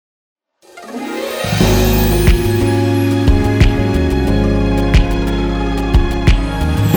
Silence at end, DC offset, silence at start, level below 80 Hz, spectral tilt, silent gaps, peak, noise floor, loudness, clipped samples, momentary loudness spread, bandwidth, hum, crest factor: 0 s; under 0.1%; 0.75 s; -18 dBFS; -6.5 dB/octave; none; 0 dBFS; -39 dBFS; -14 LUFS; under 0.1%; 6 LU; over 20 kHz; none; 14 dB